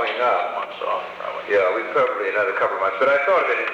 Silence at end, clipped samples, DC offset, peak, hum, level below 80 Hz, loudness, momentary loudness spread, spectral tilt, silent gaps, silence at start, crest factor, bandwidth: 0 s; under 0.1%; under 0.1%; -8 dBFS; none; -68 dBFS; -21 LUFS; 9 LU; -4 dB/octave; none; 0 s; 12 dB; 8.2 kHz